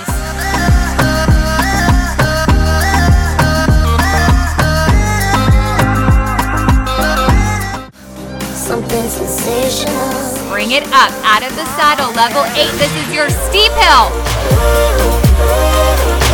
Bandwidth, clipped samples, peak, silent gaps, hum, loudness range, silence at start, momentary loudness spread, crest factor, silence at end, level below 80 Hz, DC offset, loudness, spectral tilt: 19.5 kHz; under 0.1%; 0 dBFS; none; none; 5 LU; 0 s; 8 LU; 12 dB; 0 s; -16 dBFS; under 0.1%; -12 LUFS; -4.5 dB/octave